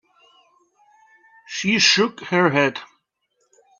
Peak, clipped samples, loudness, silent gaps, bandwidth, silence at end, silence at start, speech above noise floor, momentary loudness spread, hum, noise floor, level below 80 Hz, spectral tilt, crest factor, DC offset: -2 dBFS; under 0.1%; -18 LUFS; none; 7.6 kHz; 0.95 s; 1.5 s; 52 dB; 14 LU; none; -70 dBFS; -66 dBFS; -3 dB/octave; 22 dB; under 0.1%